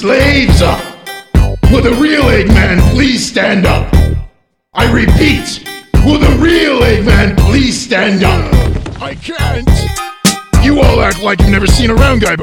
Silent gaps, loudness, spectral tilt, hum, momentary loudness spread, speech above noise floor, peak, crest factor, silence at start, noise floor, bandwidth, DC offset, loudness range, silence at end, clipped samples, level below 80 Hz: none; -10 LUFS; -5.5 dB/octave; none; 9 LU; 28 dB; 0 dBFS; 8 dB; 0 s; -36 dBFS; 18 kHz; under 0.1%; 2 LU; 0 s; 1%; -14 dBFS